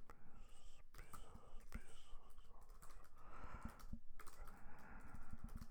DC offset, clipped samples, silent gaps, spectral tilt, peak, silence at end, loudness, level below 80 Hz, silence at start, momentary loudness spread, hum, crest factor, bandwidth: under 0.1%; under 0.1%; none; -5 dB/octave; -34 dBFS; 0 s; -62 LUFS; -56 dBFS; 0 s; 10 LU; none; 14 dB; 16.5 kHz